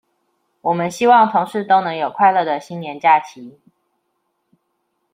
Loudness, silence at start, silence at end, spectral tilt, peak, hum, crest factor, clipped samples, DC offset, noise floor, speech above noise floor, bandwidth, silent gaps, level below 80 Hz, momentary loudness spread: -16 LUFS; 0.65 s; 1.65 s; -5 dB/octave; -2 dBFS; none; 16 dB; under 0.1%; under 0.1%; -70 dBFS; 54 dB; 15.5 kHz; none; -70 dBFS; 12 LU